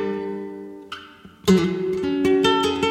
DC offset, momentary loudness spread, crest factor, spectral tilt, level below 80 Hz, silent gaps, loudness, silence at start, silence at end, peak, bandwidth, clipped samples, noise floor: under 0.1%; 19 LU; 16 dB; -5.5 dB/octave; -52 dBFS; none; -21 LUFS; 0 s; 0 s; -6 dBFS; 15.5 kHz; under 0.1%; -44 dBFS